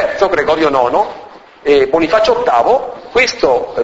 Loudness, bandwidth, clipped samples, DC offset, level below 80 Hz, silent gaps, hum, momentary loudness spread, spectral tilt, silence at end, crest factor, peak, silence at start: -13 LUFS; 8 kHz; under 0.1%; under 0.1%; -42 dBFS; none; none; 6 LU; -4 dB/octave; 0 s; 12 dB; 0 dBFS; 0 s